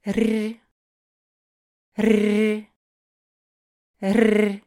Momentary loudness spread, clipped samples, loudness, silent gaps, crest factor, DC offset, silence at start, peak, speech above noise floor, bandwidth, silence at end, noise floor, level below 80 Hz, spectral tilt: 12 LU; under 0.1%; -21 LUFS; 0.71-1.92 s, 2.76-3.94 s; 20 dB; under 0.1%; 0.05 s; -4 dBFS; over 70 dB; 15.5 kHz; 0.1 s; under -90 dBFS; -58 dBFS; -6.5 dB/octave